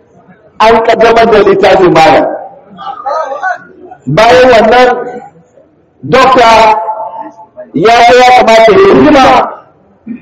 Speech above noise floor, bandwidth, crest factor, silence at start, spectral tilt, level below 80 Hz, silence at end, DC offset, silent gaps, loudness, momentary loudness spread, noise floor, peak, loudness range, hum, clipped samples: 40 dB; 13.5 kHz; 6 dB; 0.6 s; -5 dB/octave; -36 dBFS; 0.05 s; under 0.1%; none; -5 LUFS; 18 LU; -43 dBFS; 0 dBFS; 4 LU; none; 4%